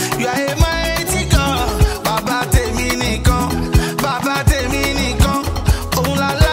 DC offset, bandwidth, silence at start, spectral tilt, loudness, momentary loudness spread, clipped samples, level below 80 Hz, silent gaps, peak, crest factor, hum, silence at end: under 0.1%; 16.5 kHz; 0 s; -4.5 dB/octave; -17 LUFS; 3 LU; under 0.1%; -20 dBFS; none; 0 dBFS; 16 dB; none; 0 s